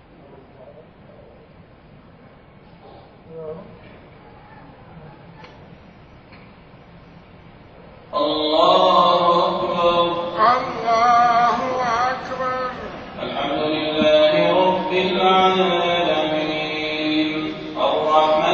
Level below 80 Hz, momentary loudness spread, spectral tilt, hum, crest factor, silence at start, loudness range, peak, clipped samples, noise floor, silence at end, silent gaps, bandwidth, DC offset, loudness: -52 dBFS; 13 LU; -5 dB/octave; none; 18 dB; 0.3 s; 13 LU; -2 dBFS; under 0.1%; -46 dBFS; 0 s; none; 7.4 kHz; under 0.1%; -18 LUFS